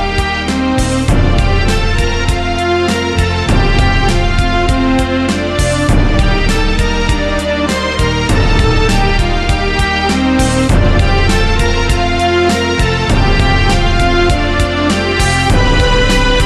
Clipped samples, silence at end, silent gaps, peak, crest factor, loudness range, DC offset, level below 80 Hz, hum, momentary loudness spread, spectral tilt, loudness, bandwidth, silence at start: under 0.1%; 0 s; none; -2 dBFS; 10 dB; 1 LU; under 0.1%; -16 dBFS; none; 3 LU; -5 dB/octave; -12 LUFS; 13 kHz; 0 s